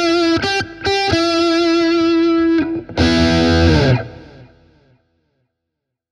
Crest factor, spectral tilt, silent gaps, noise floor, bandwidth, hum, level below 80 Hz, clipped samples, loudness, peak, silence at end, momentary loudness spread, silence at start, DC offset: 16 dB; -5.5 dB/octave; none; -79 dBFS; 10.5 kHz; none; -32 dBFS; under 0.1%; -15 LUFS; 0 dBFS; 1.65 s; 6 LU; 0 s; under 0.1%